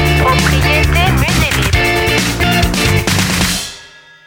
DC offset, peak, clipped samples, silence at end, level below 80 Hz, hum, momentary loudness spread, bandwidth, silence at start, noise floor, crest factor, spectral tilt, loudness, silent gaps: under 0.1%; 0 dBFS; under 0.1%; 0.4 s; -20 dBFS; none; 2 LU; 18.5 kHz; 0 s; -38 dBFS; 12 dB; -4 dB/octave; -12 LUFS; none